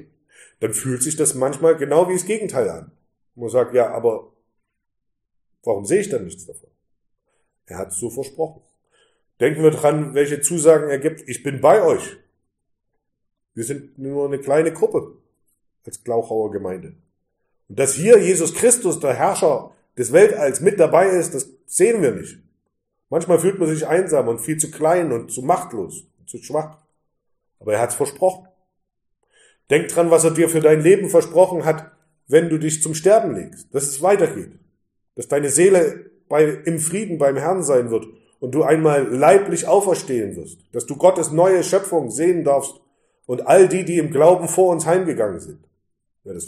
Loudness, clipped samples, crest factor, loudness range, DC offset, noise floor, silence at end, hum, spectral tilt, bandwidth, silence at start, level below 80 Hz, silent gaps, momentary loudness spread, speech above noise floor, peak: -18 LUFS; under 0.1%; 18 dB; 9 LU; under 0.1%; -74 dBFS; 0 s; none; -5 dB/octave; 15 kHz; 0.6 s; -64 dBFS; none; 16 LU; 57 dB; 0 dBFS